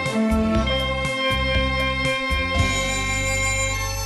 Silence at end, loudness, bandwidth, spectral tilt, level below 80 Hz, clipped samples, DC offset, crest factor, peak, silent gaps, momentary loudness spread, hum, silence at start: 0 s; -21 LUFS; 12.5 kHz; -4 dB/octave; -30 dBFS; under 0.1%; under 0.1%; 14 dB; -8 dBFS; none; 2 LU; none; 0 s